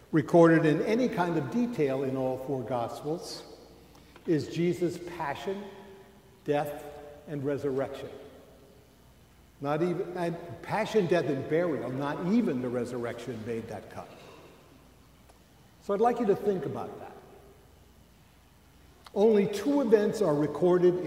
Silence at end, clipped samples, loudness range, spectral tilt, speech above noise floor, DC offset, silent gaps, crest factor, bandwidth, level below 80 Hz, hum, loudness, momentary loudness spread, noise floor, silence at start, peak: 0 s; under 0.1%; 7 LU; -7 dB/octave; 30 dB; under 0.1%; none; 22 dB; 16 kHz; -62 dBFS; none; -29 LUFS; 18 LU; -58 dBFS; 0.1 s; -8 dBFS